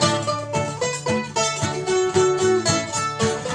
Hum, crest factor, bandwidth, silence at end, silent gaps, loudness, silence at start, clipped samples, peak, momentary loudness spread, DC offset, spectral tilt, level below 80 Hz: none; 16 dB; 11 kHz; 0 s; none; -21 LUFS; 0 s; under 0.1%; -6 dBFS; 6 LU; under 0.1%; -4 dB/octave; -54 dBFS